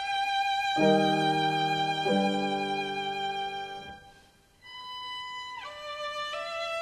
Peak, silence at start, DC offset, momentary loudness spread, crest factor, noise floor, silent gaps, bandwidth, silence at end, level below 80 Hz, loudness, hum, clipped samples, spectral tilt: -12 dBFS; 0 s; under 0.1%; 16 LU; 18 dB; -59 dBFS; none; 13 kHz; 0 s; -64 dBFS; -29 LUFS; none; under 0.1%; -4.5 dB/octave